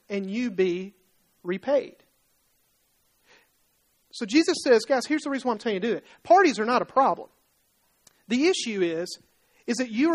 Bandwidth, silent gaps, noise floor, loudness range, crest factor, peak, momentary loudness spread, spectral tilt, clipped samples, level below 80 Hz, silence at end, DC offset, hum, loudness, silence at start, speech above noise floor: 12.5 kHz; none; -68 dBFS; 9 LU; 18 dB; -8 dBFS; 15 LU; -4 dB/octave; under 0.1%; -72 dBFS; 0 s; under 0.1%; none; -25 LUFS; 0.1 s; 44 dB